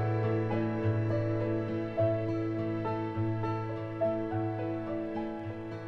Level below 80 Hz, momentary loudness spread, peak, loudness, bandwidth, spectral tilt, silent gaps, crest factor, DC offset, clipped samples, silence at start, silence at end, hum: -56 dBFS; 6 LU; -18 dBFS; -33 LUFS; 6 kHz; -10 dB/octave; none; 14 dB; under 0.1%; under 0.1%; 0 s; 0 s; none